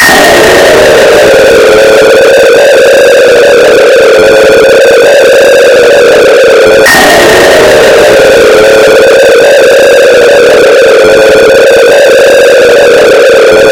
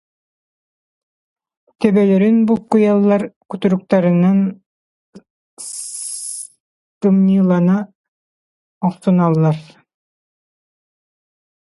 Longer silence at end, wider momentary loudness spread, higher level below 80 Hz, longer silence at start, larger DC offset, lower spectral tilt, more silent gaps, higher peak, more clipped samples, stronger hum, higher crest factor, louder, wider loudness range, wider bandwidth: second, 0 s vs 2 s; second, 1 LU vs 14 LU; first, -32 dBFS vs -62 dBFS; second, 0 s vs 1.8 s; neither; second, -2.5 dB/octave vs -7.5 dB/octave; second, none vs 3.36-3.41 s, 4.66-5.13 s, 5.30-5.57 s, 6.60-7.01 s, 7.95-8.81 s; about the same, 0 dBFS vs 0 dBFS; first, 30% vs under 0.1%; neither; second, 2 dB vs 18 dB; first, -1 LUFS vs -16 LUFS; second, 0 LU vs 6 LU; first, over 20 kHz vs 11.5 kHz